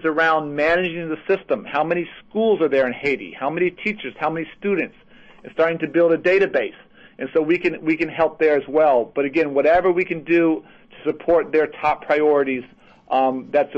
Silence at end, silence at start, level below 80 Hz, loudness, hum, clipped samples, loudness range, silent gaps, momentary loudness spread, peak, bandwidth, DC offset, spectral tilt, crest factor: 0 s; 0 s; -54 dBFS; -20 LUFS; none; under 0.1%; 3 LU; none; 9 LU; -6 dBFS; 7.6 kHz; under 0.1%; -7 dB/octave; 14 dB